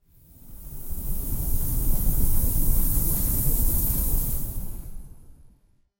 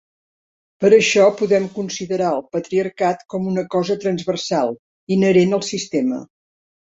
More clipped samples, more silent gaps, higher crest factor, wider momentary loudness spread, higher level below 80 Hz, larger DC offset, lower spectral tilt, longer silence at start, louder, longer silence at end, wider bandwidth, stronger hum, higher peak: neither; second, none vs 4.79-5.07 s; about the same, 16 dB vs 18 dB; first, 16 LU vs 10 LU; first, -26 dBFS vs -62 dBFS; neither; about the same, -5 dB/octave vs -5 dB/octave; second, 0.45 s vs 0.8 s; second, -26 LUFS vs -18 LUFS; about the same, 0.5 s vs 0.6 s; first, 17 kHz vs 8 kHz; neither; second, -8 dBFS vs -2 dBFS